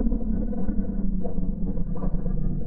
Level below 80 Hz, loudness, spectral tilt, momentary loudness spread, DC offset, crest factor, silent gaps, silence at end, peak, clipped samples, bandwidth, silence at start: -26 dBFS; -30 LUFS; -14 dB/octave; 2 LU; under 0.1%; 14 dB; none; 0 s; -10 dBFS; under 0.1%; 1.8 kHz; 0 s